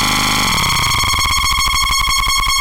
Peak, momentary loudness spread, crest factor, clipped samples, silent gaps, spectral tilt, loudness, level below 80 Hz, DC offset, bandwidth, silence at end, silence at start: -6 dBFS; 0 LU; 8 dB; under 0.1%; none; -1 dB/octave; -13 LUFS; -24 dBFS; under 0.1%; 17.5 kHz; 0 s; 0 s